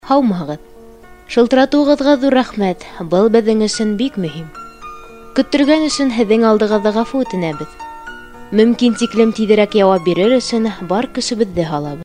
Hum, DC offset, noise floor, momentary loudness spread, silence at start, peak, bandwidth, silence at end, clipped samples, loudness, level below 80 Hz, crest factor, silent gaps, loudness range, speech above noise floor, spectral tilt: none; under 0.1%; -39 dBFS; 18 LU; 0.05 s; 0 dBFS; 10.5 kHz; 0 s; under 0.1%; -14 LUFS; -44 dBFS; 14 dB; none; 2 LU; 25 dB; -5.5 dB/octave